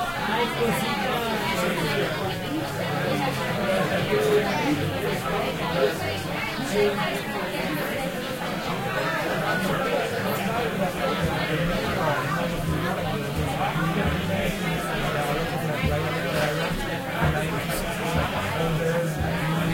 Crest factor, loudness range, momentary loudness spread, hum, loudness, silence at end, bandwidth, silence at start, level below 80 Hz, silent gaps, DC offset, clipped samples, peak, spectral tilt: 16 dB; 2 LU; 4 LU; none; -25 LUFS; 0 s; 16.5 kHz; 0 s; -42 dBFS; none; under 0.1%; under 0.1%; -10 dBFS; -5 dB/octave